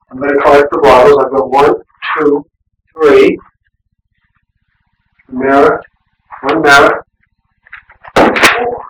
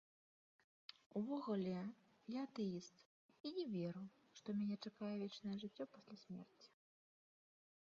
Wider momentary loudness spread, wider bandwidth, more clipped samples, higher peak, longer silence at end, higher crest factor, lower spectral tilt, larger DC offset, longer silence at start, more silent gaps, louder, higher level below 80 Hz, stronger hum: second, 12 LU vs 18 LU; first, over 20 kHz vs 7.4 kHz; neither; first, 0 dBFS vs -32 dBFS; second, 0.05 s vs 1.25 s; second, 10 dB vs 16 dB; second, -4 dB/octave vs -6.5 dB/octave; neither; second, 0.15 s vs 1.15 s; second, none vs 3.05-3.29 s, 3.40-3.44 s; first, -9 LUFS vs -48 LUFS; first, -40 dBFS vs -90 dBFS; neither